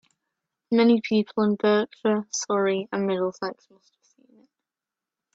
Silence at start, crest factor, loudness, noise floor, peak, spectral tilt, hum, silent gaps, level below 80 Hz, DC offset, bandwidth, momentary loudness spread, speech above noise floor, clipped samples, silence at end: 0.7 s; 16 dB; -24 LUFS; -89 dBFS; -8 dBFS; -5 dB/octave; none; none; -74 dBFS; under 0.1%; 8 kHz; 7 LU; 65 dB; under 0.1%; 1.8 s